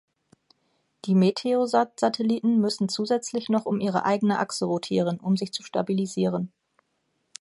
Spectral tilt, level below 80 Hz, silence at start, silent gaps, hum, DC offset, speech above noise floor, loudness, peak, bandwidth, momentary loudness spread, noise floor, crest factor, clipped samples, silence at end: -6 dB/octave; -70 dBFS; 1.05 s; none; none; under 0.1%; 50 dB; -25 LUFS; -8 dBFS; 11.5 kHz; 5 LU; -74 dBFS; 18 dB; under 0.1%; 0.95 s